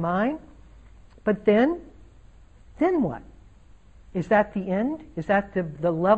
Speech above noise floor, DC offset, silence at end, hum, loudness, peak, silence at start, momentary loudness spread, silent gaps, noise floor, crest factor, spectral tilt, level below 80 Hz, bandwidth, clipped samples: 29 dB; 0.1%; 0 s; none; -25 LUFS; -6 dBFS; 0 s; 12 LU; none; -52 dBFS; 18 dB; -8.5 dB/octave; -50 dBFS; 8.2 kHz; under 0.1%